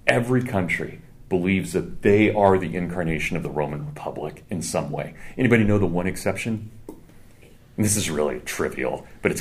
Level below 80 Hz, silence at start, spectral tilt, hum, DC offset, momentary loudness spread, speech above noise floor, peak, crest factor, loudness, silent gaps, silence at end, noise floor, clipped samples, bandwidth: -42 dBFS; 0.05 s; -5.5 dB/octave; none; under 0.1%; 14 LU; 25 dB; 0 dBFS; 24 dB; -23 LUFS; none; 0 s; -48 dBFS; under 0.1%; 15.5 kHz